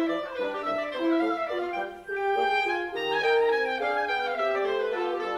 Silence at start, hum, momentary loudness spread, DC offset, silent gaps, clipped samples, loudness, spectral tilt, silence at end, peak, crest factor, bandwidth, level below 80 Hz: 0 s; none; 7 LU; under 0.1%; none; under 0.1%; -27 LUFS; -4 dB/octave; 0 s; -14 dBFS; 14 dB; 13.5 kHz; -64 dBFS